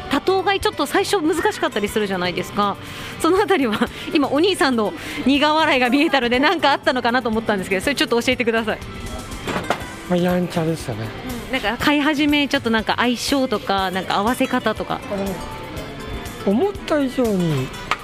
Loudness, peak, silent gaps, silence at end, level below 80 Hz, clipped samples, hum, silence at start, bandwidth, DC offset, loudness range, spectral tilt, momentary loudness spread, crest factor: -19 LUFS; -2 dBFS; none; 0 s; -42 dBFS; under 0.1%; none; 0 s; 15.5 kHz; under 0.1%; 5 LU; -4.5 dB/octave; 12 LU; 18 dB